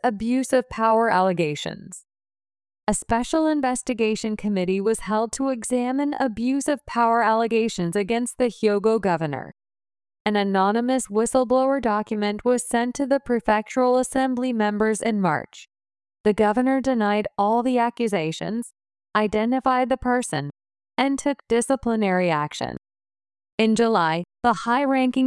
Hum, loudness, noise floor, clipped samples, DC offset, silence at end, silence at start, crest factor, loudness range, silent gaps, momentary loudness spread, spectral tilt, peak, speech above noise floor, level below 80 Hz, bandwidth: none; -22 LUFS; under -90 dBFS; under 0.1%; under 0.1%; 0 s; 0.05 s; 16 dB; 2 LU; 10.20-10.25 s, 16.20-16.24 s, 23.52-23.58 s; 8 LU; -5 dB/octave; -6 dBFS; over 68 dB; -52 dBFS; 12 kHz